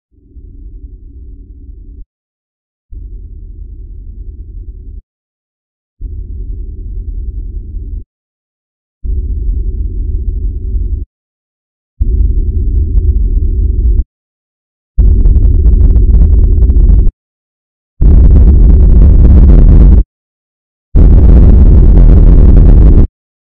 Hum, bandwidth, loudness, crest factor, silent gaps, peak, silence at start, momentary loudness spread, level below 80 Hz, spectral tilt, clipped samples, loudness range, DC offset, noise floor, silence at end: none; 1.8 kHz; -9 LUFS; 8 dB; 2.06-2.89 s, 5.03-5.97 s, 8.06-9.01 s, 11.06-11.97 s, 14.06-14.95 s, 17.13-17.97 s, 20.05-20.92 s; 0 dBFS; 0.35 s; 24 LU; -8 dBFS; -12.5 dB/octave; 6%; 23 LU; under 0.1%; -33 dBFS; 0.4 s